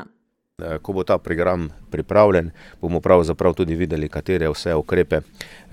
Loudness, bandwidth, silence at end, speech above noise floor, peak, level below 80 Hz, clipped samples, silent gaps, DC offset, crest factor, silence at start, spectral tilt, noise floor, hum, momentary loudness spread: -20 LUFS; 15 kHz; 0.15 s; 45 dB; 0 dBFS; -38 dBFS; under 0.1%; none; under 0.1%; 20 dB; 0 s; -7 dB/octave; -65 dBFS; none; 15 LU